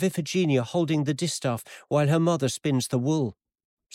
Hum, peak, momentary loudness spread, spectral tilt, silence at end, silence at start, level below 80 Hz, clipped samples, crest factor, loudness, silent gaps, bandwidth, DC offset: none; -12 dBFS; 6 LU; -5.5 dB/octave; 0.65 s; 0 s; -66 dBFS; under 0.1%; 14 dB; -26 LUFS; none; 16 kHz; under 0.1%